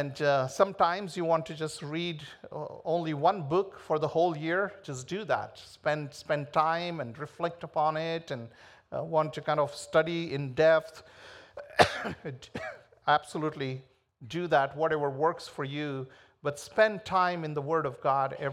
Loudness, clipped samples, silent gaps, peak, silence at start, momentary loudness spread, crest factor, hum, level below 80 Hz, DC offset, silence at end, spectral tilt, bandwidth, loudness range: -30 LUFS; under 0.1%; none; -4 dBFS; 0 s; 15 LU; 26 dB; none; -68 dBFS; under 0.1%; 0 s; -5.5 dB/octave; 13.5 kHz; 3 LU